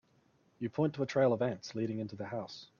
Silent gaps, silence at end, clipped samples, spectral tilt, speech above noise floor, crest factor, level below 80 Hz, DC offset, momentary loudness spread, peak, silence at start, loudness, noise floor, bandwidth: none; 0.15 s; under 0.1%; -7 dB/octave; 36 dB; 18 dB; -74 dBFS; under 0.1%; 11 LU; -18 dBFS; 0.6 s; -35 LUFS; -70 dBFS; 7.2 kHz